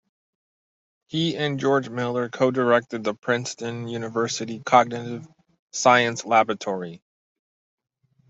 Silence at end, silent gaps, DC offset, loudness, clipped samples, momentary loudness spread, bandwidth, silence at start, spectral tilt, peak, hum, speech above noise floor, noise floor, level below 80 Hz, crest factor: 1.35 s; 5.59-5.68 s; under 0.1%; -23 LUFS; under 0.1%; 12 LU; 8.2 kHz; 1.1 s; -4.5 dB/octave; -2 dBFS; none; over 67 dB; under -90 dBFS; -68 dBFS; 22 dB